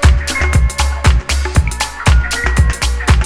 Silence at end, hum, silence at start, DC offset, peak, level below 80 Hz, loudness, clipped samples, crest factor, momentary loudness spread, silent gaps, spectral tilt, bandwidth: 0 s; none; 0 s; under 0.1%; 0 dBFS; -14 dBFS; -14 LUFS; 0.1%; 12 dB; 3 LU; none; -4 dB/octave; 13.5 kHz